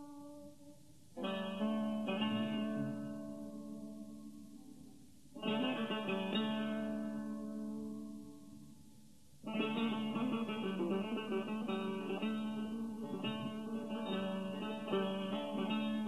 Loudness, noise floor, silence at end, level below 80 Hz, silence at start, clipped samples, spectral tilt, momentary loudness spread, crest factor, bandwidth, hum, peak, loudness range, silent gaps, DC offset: -40 LUFS; -63 dBFS; 0 s; -74 dBFS; 0 s; under 0.1%; -6.5 dB/octave; 18 LU; 16 dB; 13 kHz; none; -24 dBFS; 4 LU; none; under 0.1%